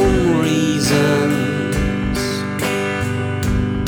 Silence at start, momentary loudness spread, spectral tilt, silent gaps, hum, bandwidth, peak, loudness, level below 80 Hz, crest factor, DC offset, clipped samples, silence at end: 0 s; 6 LU; -5.5 dB/octave; none; 50 Hz at -40 dBFS; over 20 kHz; -4 dBFS; -18 LUFS; -30 dBFS; 14 dB; under 0.1%; under 0.1%; 0 s